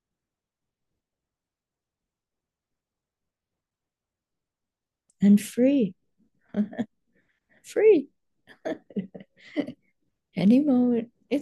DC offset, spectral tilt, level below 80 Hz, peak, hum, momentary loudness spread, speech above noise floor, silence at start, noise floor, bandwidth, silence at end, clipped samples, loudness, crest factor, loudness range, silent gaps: under 0.1%; -7.5 dB/octave; -74 dBFS; -8 dBFS; none; 17 LU; 67 dB; 5.2 s; -89 dBFS; 12.5 kHz; 0 s; under 0.1%; -24 LUFS; 18 dB; 3 LU; none